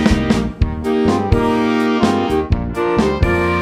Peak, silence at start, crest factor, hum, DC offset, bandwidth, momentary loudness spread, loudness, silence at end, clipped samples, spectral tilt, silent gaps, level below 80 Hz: 0 dBFS; 0 s; 16 dB; none; under 0.1%; 13.5 kHz; 3 LU; -16 LUFS; 0 s; under 0.1%; -7 dB/octave; none; -26 dBFS